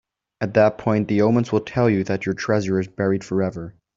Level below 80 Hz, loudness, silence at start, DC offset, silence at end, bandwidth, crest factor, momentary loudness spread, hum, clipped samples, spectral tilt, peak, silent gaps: -54 dBFS; -21 LUFS; 0.4 s; under 0.1%; 0.25 s; 7.8 kHz; 18 dB; 6 LU; none; under 0.1%; -7.5 dB/octave; -4 dBFS; none